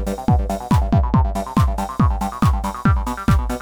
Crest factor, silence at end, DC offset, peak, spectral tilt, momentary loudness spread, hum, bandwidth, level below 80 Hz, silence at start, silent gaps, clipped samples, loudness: 16 dB; 0 s; under 0.1%; -2 dBFS; -7.5 dB/octave; 3 LU; none; 19.5 kHz; -22 dBFS; 0 s; none; under 0.1%; -19 LUFS